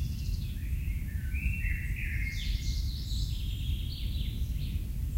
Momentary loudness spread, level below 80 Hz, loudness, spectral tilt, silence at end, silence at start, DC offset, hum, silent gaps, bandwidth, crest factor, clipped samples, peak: 2 LU; -34 dBFS; -35 LUFS; -5 dB/octave; 0 s; 0 s; under 0.1%; none; none; 16 kHz; 14 dB; under 0.1%; -18 dBFS